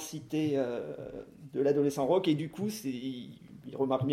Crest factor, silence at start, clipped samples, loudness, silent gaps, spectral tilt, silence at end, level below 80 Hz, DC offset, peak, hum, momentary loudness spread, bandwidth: 16 dB; 0 s; under 0.1%; -32 LUFS; none; -6.5 dB/octave; 0 s; -68 dBFS; under 0.1%; -16 dBFS; none; 17 LU; 16 kHz